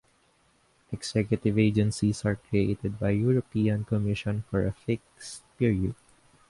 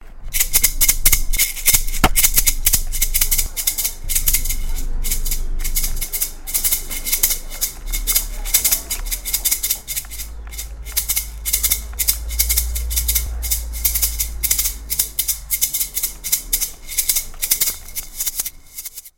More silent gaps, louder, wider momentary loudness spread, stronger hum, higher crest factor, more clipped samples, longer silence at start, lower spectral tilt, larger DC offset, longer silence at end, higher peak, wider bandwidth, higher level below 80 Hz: neither; second, -28 LUFS vs -18 LUFS; about the same, 11 LU vs 10 LU; neither; about the same, 18 dB vs 20 dB; neither; first, 0.9 s vs 0 s; first, -7 dB/octave vs -0.5 dB/octave; neither; first, 0.55 s vs 0.1 s; second, -10 dBFS vs 0 dBFS; second, 11.5 kHz vs 17 kHz; second, -48 dBFS vs -24 dBFS